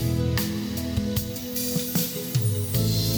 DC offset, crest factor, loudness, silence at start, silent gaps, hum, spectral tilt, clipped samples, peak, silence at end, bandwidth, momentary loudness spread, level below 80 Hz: under 0.1%; 16 dB; -26 LUFS; 0 s; none; none; -5 dB/octave; under 0.1%; -10 dBFS; 0 s; over 20 kHz; 4 LU; -40 dBFS